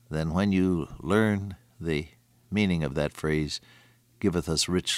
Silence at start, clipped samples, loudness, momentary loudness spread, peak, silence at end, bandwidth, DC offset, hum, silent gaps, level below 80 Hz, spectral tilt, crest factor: 0.1 s; under 0.1%; -28 LUFS; 9 LU; -10 dBFS; 0 s; 15 kHz; under 0.1%; none; none; -46 dBFS; -5 dB/octave; 18 dB